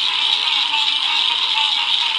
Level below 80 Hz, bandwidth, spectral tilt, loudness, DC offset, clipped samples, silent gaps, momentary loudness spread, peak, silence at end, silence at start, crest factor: -76 dBFS; 11.5 kHz; 2.5 dB/octave; -15 LUFS; under 0.1%; under 0.1%; none; 0 LU; -2 dBFS; 0 s; 0 s; 16 dB